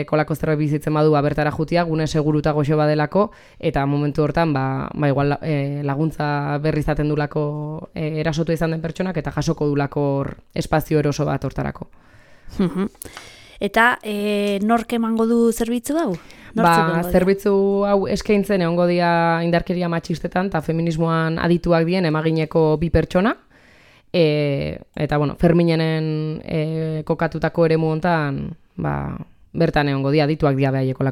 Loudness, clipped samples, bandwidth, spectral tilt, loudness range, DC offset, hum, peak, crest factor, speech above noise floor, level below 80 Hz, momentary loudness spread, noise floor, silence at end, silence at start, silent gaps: -20 LUFS; under 0.1%; 16 kHz; -7 dB/octave; 4 LU; under 0.1%; none; -2 dBFS; 18 dB; 31 dB; -40 dBFS; 9 LU; -50 dBFS; 0 s; 0 s; none